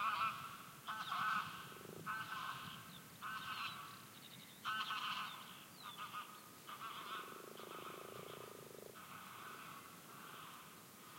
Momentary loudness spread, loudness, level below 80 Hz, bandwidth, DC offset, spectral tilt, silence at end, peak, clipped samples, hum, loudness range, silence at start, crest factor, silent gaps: 14 LU; -47 LUFS; -86 dBFS; 16.5 kHz; under 0.1%; -2 dB/octave; 0 s; -28 dBFS; under 0.1%; none; 8 LU; 0 s; 20 dB; none